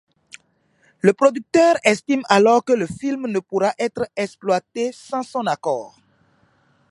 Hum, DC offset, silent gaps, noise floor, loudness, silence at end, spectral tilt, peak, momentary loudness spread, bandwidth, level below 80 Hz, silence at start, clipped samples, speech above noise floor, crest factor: none; under 0.1%; none; -62 dBFS; -19 LUFS; 1.05 s; -5 dB/octave; 0 dBFS; 11 LU; 11.5 kHz; -62 dBFS; 1.05 s; under 0.1%; 43 dB; 20 dB